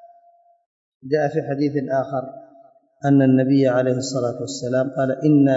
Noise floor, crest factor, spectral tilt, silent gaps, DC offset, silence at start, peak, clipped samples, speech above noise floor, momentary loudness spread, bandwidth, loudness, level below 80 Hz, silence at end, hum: -55 dBFS; 14 dB; -7 dB/octave; 0.66-1.00 s; under 0.1%; 0 s; -6 dBFS; under 0.1%; 36 dB; 11 LU; 8 kHz; -20 LUFS; -68 dBFS; 0 s; none